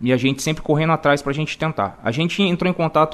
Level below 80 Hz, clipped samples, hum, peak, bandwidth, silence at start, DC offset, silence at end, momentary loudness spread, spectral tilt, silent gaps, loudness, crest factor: -48 dBFS; under 0.1%; none; -2 dBFS; 13.5 kHz; 0 s; under 0.1%; 0 s; 6 LU; -5.5 dB/octave; none; -20 LUFS; 16 dB